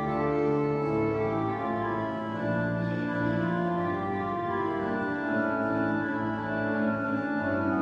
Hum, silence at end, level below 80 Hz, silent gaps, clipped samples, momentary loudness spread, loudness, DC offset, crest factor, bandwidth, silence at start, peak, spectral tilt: none; 0 s; -56 dBFS; none; under 0.1%; 3 LU; -29 LUFS; under 0.1%; 12 dB; 7 kHz; 0 s; -16 dBFS; -9 dB/octave